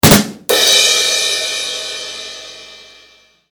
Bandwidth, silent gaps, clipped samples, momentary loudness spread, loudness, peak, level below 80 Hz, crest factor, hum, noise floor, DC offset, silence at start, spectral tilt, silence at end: over 20 kHz; none; 0.2%; 21 LU; -12 LUFS; 0 dBFS; -40 dBFS; 16 dB; none; -48 dBFS; under 0.1%; 0.05 s; -2.5 dB/octave; 0.7 s